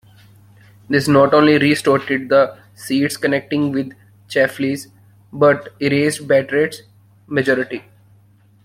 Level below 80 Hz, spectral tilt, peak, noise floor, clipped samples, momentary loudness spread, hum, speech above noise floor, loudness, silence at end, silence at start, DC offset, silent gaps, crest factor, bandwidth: -58 dBFS; -5.5 dB/octave; 0 dBFS; -51 dBFS; under 0.1%; 13 LU; none; 35 dB; -17 LUFS; 0.85 s; 0.9 s; under 0.1%; none; 16 dB; 16 kHz